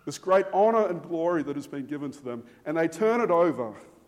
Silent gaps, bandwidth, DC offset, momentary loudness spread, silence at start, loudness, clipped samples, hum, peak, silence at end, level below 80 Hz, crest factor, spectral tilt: none; 15 kHz; under 0.1%; 14 LU; 0.05 s; -26 LUFS; under 0.1%; none; -10 dBFS; 0.25 s; -72 dBFS; 16 dB; -6 dB/octave